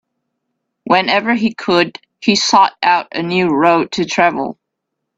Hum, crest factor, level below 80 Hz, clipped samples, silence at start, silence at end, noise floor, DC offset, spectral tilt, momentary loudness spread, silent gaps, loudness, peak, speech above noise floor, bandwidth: none; 16 dB; -58 dBFS; under 0.1%; 0.85 s; 0.65 s; -76 dBFS; under 0.1%; -4 dB/octave; 7 LU; none; -14 LUFS; 0 dBFS; 62 dB; 8 kHz